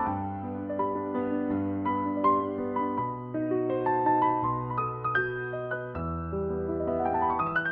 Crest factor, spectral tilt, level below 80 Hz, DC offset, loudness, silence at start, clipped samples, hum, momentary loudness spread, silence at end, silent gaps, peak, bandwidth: 16 dB; -6 dB/octave; -54 dBFS; under 0.1%; -29 LUFS; 0 s; under 0.1%; none; 8 LU; 0 s; none; -12 dBFS; 4.8 kHz